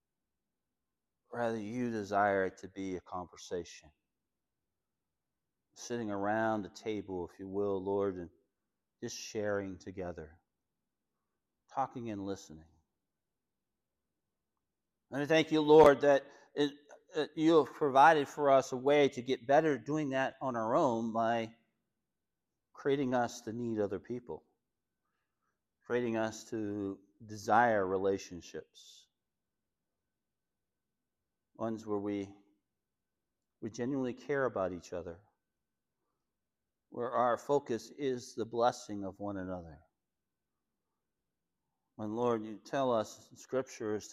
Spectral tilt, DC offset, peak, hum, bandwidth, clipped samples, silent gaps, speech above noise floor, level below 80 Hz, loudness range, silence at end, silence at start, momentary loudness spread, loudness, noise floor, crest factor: -5.5 dB/octave; under 0.1%; -12 dBFS; none; 13.5 kHz; under 0.1%; none; over 57 dB; -70 dBFS; 16 LU; 0 s; 1.3 s; 16 LU; -33 LUFS; under -90 dBFS; 24 dB